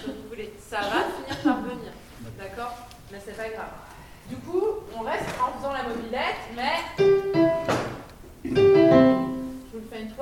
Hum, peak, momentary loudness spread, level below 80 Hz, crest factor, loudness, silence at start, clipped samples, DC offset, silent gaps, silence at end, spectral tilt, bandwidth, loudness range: none; -6 dBFS; 22 LU; -50 dBFS; 20 dB; -24 LUFS; 0 s; under 0.1%; under 0.1%; none; 0 s; -6 dB/octave; 16 kHz; 12 LU